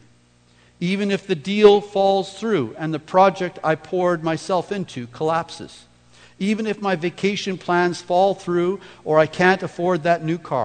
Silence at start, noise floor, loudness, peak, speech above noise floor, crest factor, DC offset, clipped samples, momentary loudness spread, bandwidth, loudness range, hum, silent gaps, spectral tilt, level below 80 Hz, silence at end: 0.8 s; -55 dBFS; -20 LUFS; -2 dBFS; 35 dB; 20 dB; under 0.1%; under 0.1%; 10 LU; 9.4 kHz; 6 LU; 60 Hz at -50 dBFS; none; -6 dB/octave; -60 dBFS; 0 s